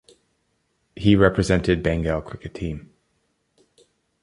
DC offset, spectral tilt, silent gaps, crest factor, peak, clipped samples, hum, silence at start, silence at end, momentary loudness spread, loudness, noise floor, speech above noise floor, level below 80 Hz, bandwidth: under 0.1%; -6.5 dB/octave; none; 22 dB; -2 dBFS; under 0.1%; none; 0.95 s; 1.45 s; 15 LU; -21 LUFS; -70 dBFS; 50 dB; -38 dBFS; 11 kHz